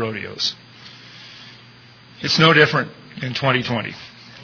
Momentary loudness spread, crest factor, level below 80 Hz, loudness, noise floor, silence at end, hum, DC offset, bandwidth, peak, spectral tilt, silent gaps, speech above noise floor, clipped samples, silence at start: 26 LU; 20 dB; -58 dBFS; -18 LUFS; -46 dBFS; 0 s; none; under 0.1%; 5.4 kHz; -2 dBFS; -4.5 dB/octave; none; 27 dB; under 0.1%; 0 s